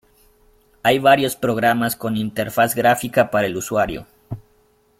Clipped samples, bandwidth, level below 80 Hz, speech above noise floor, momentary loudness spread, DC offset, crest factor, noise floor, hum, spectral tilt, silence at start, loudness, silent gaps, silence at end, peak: under 0.1%; 16.5 kHz; -50 dBFS; 40 dB; 19 LU; under 0.1%; 18 dB; -58 dBFS; none; -4.5 dB/octave; 0.85 s; -18 LUFS; none; 0.6 s; -2 dBFS